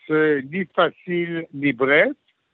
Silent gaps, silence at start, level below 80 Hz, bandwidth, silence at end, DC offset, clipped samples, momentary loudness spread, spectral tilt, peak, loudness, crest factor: none; 0.1 s; -72 dBFS; 4.3 kHz; 0.4 s; under 0.1%; under 0.1%; 9 LU; -3.5 dB/octave; -4 dBFS; -21 LUFS; 18 dB